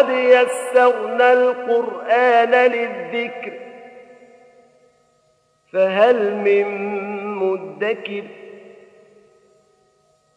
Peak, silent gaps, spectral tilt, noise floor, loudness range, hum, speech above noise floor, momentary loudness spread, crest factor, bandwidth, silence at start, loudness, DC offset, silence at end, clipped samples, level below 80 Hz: 0 dBFS; none; -4.5 dB/octave; -62 dBFS; 11 LU; none; 45 dB; 16 LU; 18 dB; 11 kHz; 0 s; -17 LUFS; under 0.1%; 1.7 s; under 0.1%; -78 dBFS